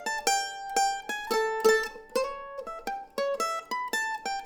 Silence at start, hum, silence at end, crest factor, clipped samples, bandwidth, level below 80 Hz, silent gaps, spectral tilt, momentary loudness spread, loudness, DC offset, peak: 0 s; none; 0 s; 18 dB; under 0.1%; over 20 kHz; -60 dBFS; none; -0.5 dB/octave; 12 LU; -29 LUFS; under 0.1%; -10 dBFS